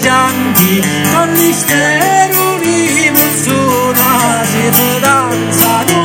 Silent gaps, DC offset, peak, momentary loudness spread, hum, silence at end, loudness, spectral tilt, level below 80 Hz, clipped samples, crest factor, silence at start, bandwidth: none; under 0.1%; 0 dBFS; 3 LU; none; 0 s; -9 LUFS; -3.5 dB/octave; -46 dBFS; 0.4%; 10 dB; 0 s; over 20 kHz